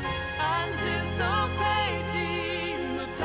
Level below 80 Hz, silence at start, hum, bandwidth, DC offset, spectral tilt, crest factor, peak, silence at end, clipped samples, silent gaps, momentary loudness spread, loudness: -40 dBFS; 0 s; none; 4 kHz; under 0.1%; -3 dB/octave; 14 dB; -14 dBFS; 0 s; under 0.1%; none; 5 LU; -28 LUFS